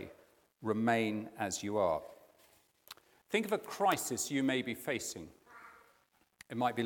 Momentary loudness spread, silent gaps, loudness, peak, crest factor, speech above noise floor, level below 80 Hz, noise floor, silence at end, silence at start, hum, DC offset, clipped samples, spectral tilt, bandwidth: 23 LU; none; -35 LUFS; -16 dBFS; 20 dB; 37 dB; -76 dBFS; -72 dBFS; 0 s; 0 s; none; under 0.1%; under 0.1%; -4 dB/octave; 18 kHz